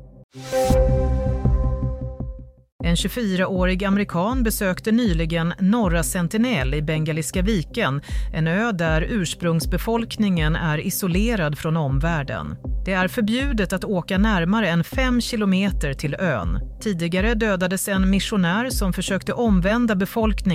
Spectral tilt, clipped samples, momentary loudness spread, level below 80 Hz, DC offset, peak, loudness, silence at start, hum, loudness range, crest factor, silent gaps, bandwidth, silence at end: -5.5 dB/octave; under 0.1%; 6 LU; -28 dBFS; under 0.1%; -6 dBFS; -22 LUFS; 0 s; none; 2 LU; 14 dB; 0.24-0.29 s, 2.72-2.79 s; 16 kHz; 0 s